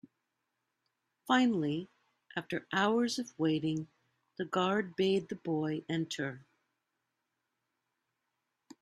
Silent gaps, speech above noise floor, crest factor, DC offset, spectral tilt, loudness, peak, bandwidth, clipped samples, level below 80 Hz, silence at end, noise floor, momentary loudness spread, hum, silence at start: none; 53 dB; 22 dB; under 0.1%; -5.5 dB/octave; -33 LUFS; -14 dBFS; 13.5 kHz; under 0.1%; -78 dBFS; 2.4 s; -85 dBFS; 14 LU; none; 1.25 s